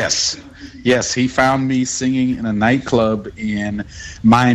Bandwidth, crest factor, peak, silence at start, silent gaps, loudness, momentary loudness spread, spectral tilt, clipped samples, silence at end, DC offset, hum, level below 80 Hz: 10.5 kHz; 14 dB; -2 dBFS; 0 s; none; -17 LUFS; 9 LU; -4.5 dB/octave; under 0.1%; 0 s; under 0.1%; none; -42 dBFS